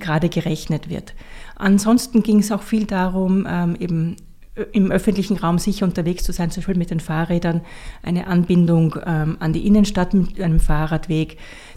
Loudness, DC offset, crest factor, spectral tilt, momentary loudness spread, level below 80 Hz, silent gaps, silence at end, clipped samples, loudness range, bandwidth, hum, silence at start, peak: -19 LUFS; under 0.1%; 14 dB; -6.5 dB/octave; 9 LU; -30 dBFS; none; 0.05 s; under 0.1%; 3 LU; 15 kHz; none; 0 s; -4 dBFS